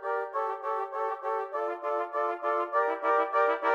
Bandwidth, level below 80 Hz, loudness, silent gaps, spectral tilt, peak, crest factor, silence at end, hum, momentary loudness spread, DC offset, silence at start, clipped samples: 7.4 kHz; -86 dBFS; -30 LUFS; none; -2.5 dB/octave; -14 dBFS; 16 dB; 0 s; none; 6 LU; under 0.1%; 0 s; under 0.1%